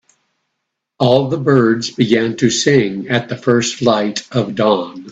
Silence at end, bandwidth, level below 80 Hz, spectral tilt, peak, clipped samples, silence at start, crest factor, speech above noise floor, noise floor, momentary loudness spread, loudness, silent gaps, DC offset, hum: 0 s; 8.4 kHz; -54 dBFS; -5 dB/octave; 0 dBFS; under 0.1%; 1 s; 16 dB; 61 dB; -75 dBFS; 6 LU; -15 LUFS; none; under 0.1%; none